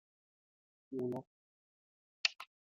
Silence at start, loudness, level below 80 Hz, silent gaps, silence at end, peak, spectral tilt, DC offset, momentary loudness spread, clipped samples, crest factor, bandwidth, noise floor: 0.9 s; -39 LUFS; -90 dBFS; 1.27-2.24 s; 0.3 s; -14 dBFS; -2 dB/octave; under 0.1%; 11 LU; under 0.1%; 32 dB; 7.6 kHz; under -90 dBFS